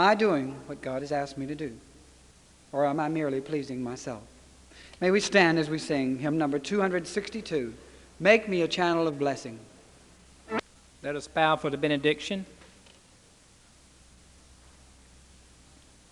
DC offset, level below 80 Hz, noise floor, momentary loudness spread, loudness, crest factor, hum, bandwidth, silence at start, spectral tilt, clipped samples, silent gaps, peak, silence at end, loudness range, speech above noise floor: under 0.1%; -60 dBFS; -58 dBFS; 16 LU; -28 LUFS; 24 dB; none; 12 kHz; 0 s; -5 dB/octave; under 0.1%; none; -6 dBFS; 3.55 s; 6 LU; 30 dB